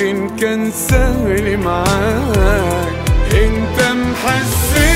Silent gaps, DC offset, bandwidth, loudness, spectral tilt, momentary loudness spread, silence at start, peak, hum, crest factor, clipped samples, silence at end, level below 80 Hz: none; under 0.1%; 16.5 kHz; -15 LUFS; -5 dB/octave; 4 LU; 0 s; 0 dBFS; none; 14 dB; under 0.1%; 0 s; -20 dBFS